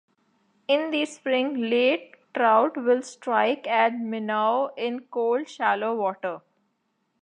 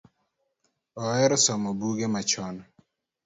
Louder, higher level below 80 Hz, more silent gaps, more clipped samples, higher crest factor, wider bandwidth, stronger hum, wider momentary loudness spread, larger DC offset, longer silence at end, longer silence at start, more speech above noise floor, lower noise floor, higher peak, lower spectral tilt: about the same, -24 LUFS vs -25 LUFS; second, -86 dBFS vs -66 dBFS; neither; neither; about the same, 18 dB vs 20 dB; first, 10 kHz vs 8 kHz; neither; second, 9 LU vs 18 LU; neither; first, 0.85 s vs 0.65 s; second, 0.7 s vs 0.95 s; about the same, 50 dB vs 50 dB; about the same, -74 dBFS vs -76 dBFS; first, -6 dBFS vs -10 dBFS; about the same, -4 dB/octave vs -3.5 dB/octave